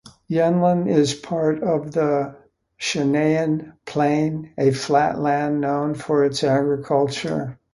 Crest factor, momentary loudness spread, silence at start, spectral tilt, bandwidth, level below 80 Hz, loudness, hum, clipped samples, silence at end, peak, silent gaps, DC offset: 16 dB; 7 LU; 0.05 s; -6 dB/octave; 11.5 kHz; -58 dBFS; -21 LUFS; none; under 0.1%; 0.2 s; -4 dBFS; none; under 0.1%